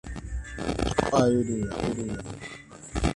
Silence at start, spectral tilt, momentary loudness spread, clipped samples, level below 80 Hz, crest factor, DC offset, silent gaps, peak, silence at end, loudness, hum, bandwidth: 0.05 s; -6 dB/octave; 16 LU; under 0.1%; -38 dBFS; 22 dB; under 0.1%; none; -6 dBFS; 0 s; -28 LUFS; none; 11.5 kHz